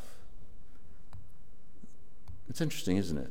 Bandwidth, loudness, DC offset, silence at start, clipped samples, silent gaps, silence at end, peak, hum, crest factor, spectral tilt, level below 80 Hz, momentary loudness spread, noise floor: 17 kHz; -34 LUFS; 2%; 0 s; under 0.1%; none; 0 s; -16 dBFS; none; 22 dB; -5.5 dB/octave; -56 dBFS; 27 LU; -57 dBFS